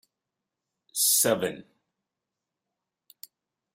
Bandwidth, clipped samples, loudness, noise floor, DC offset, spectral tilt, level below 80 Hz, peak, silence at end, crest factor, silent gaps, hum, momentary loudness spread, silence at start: 16 kHz; under 0.1%; -24 LUFS; -87 dBFS; under 0.1%; -1.5 dB/octave; -74 dBFS; -10 dBFS; 2.15 s; 22 dB; none; none; 16 LU; 0.95 s